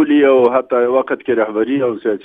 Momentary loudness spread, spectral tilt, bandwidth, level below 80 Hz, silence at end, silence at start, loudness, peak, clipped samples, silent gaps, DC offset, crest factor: 6 LU; -8 dB/octave; 3.9 kHz; -62 dBFS; 0.05 s; 0 s; -14 LUFS; 0 dBFS; under 0.1%; none; under 0.1%; 14 dB